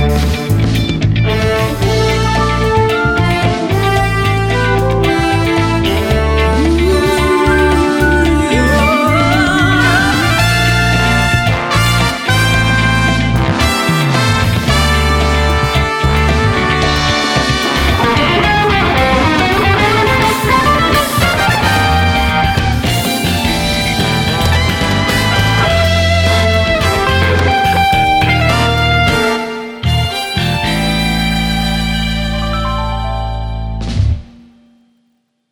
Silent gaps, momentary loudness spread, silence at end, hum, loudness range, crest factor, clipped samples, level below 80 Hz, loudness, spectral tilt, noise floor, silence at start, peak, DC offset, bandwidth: none; 4 LU; 1.25 s; none; 4 LU; 12 dB; under 0.1%; -20 dBFS; -12 LUFS; -5 dB/octave; -61 dBFS; 0 s; 0 dBFS; under 0.1%; 18 kHz